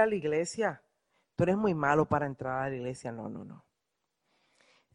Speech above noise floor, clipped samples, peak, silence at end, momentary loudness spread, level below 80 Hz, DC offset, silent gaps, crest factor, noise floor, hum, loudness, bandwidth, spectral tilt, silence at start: 53 dB; under 0.1%; -12 dBFS; 1.35 s; 16 LU; -62 dBFS; under 0.1%; none; 20 dB; -84 dBFS; none; -31 LUFS; 10.5 kHz; -6.5 dB/octave; 0 s